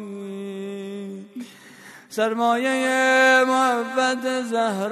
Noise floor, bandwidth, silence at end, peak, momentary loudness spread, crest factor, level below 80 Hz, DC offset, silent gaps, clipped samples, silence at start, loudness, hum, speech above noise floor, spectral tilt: -45 dBFS; 13.5 kHz; 0 s; -6 dBFS; 19 LU; 16 dB; -80 dBFS; under 0.1%; none; under 0.1%; 0 s; -20 LUFS; none; 25 dB; -3.5 dB/octave